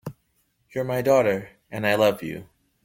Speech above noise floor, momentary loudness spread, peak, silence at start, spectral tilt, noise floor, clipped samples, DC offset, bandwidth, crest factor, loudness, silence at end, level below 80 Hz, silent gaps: 47 dB; 17 LU; -6 dBFS; 0.05 s; -5.5 dB/octave; -69 dBFS; under 0.1%; under 0.1%; 16.5 kHz; 18 dB; -23 LUFS; 0.4 s; -60 dBFS; none